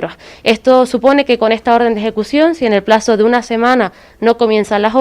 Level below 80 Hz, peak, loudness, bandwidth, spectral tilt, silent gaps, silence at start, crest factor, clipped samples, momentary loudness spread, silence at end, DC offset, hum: -46 dBFS; 0 dBFS; -12 LUFS; 13 kHz; -5 dB/octave; none; 0 s; 12 dB; 0.6%; 6 LU; 0 s; under 0.1%; none